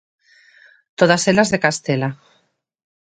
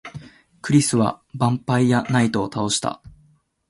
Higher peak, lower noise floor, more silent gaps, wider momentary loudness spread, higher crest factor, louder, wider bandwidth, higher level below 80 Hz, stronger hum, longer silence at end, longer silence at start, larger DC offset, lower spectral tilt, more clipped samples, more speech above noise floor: first, 0 dBFS vs -4 dBFS; first, -64 dBFS vs -58 dBFS; neither; second, 11 LU vs 18 LU; about the same, 20 dB vs 18 dB; first, -17 LUFS vs -20 LUFS; second, 9.4 kHz vs 11.5 kHz; about the same, -58 dBFS vs -54 dBFS; neither; first, 0.9 s vs 0.6 s; first, 1 s vs 0.05 s; neither; about the same, -4.5 dB/octave vs -5 dB/octave; neither; first, 47 dB vs 39 dB